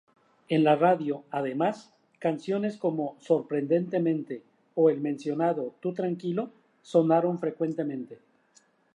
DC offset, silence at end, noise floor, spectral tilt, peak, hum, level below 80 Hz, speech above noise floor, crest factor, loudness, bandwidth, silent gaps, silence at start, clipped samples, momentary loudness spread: under 0.1%; 0.8 s; -64 dBFS; -8 dB/octave; -8 dBFS; none; -82 dBFS; 37 dB; 20 dB; -28 LUFS; 10 kHz; none; 0.5 s; under 0.1%; 11 LU